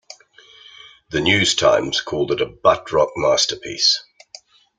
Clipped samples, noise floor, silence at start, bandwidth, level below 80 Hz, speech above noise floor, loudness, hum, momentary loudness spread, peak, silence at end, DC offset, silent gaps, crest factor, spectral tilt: under 0.1%; -48 dBFS; 0.1 s; 9.6 kHz; -52 dBFS; 30 dB; -18 LUFS; none; 7 LU; -2 dBFS; 0.75 s; under 0.1%; none; 18 dB; -2.5 dB/octave